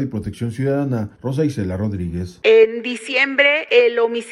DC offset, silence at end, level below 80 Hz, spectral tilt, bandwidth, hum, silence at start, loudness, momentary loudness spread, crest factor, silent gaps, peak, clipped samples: under 0.1%; 0 s; -48 dBFS; -6 dB/octave; 11.5 kHz; none; 0 s; -18 LUFS; 12 LU; 16 dB; none; -2 dBFS; under 0.1%